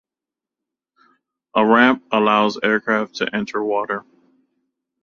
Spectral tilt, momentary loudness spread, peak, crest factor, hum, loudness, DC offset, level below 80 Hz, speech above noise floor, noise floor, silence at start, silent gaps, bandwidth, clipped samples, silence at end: -5.5 dB/octave; 10 LU; -2 dBFS; 20 dB; none; -18 LUFS; under 0.1%; -66 dBFS; 70 dB; -88 dBFS; 1.55 s; none; 7.2 kHz; under 0.1%; 1.05 s